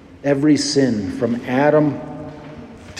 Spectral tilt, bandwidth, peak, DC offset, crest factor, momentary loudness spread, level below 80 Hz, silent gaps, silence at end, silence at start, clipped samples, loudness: -5.5 dB/octave; 10.5 kHz; -4 dBFS; under 0.1%; 16 dB; 20 LU; -52 dBFS; none; 0 s; 0.1 s; under 0.1%; -17 LUFS